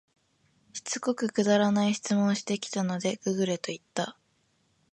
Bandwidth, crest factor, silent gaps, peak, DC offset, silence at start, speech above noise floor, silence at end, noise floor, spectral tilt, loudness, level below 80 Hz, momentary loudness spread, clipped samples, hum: 11 kHz; 18 dB; none; -12 dBFS; under 0.1%; 0.75 s; 43 dB; 0.8 s; -70 dBFS; -5 dB/octave; -28 LUFS; -74 dBFS; 10 LU; under 0.1%; none